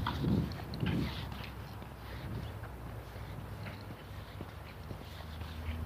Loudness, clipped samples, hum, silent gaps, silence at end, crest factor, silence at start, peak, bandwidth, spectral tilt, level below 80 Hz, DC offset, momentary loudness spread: -41 LUFS; under 0.1%; none; none; 0 s; 20 dB; 0 s; -20 dBFS; 15.5 kHz; -7 dB/octave; -48 dBFS; under 0.1%; 12 LU